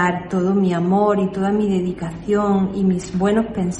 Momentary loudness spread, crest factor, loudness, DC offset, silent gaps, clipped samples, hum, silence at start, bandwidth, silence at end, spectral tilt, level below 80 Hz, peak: 4 LU; 14 dB; -19 LUFS; under 0.1%; none; under 0.1%; none; 0 s; 9.4 kHz; 0 s; -7.5 dB/octave; -44 dBFS; -4 dBFS